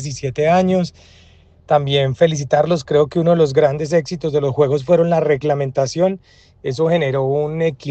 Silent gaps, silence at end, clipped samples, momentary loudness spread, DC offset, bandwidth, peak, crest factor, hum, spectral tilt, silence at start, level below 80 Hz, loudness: none; 0 s; under 0.1%; 6 LU; under 0.1%; 8.6 kHz; 0 dBFS; 16 dB; none; -6.5 dB/octave; 0 s; -50 dBFS; -17 LUFS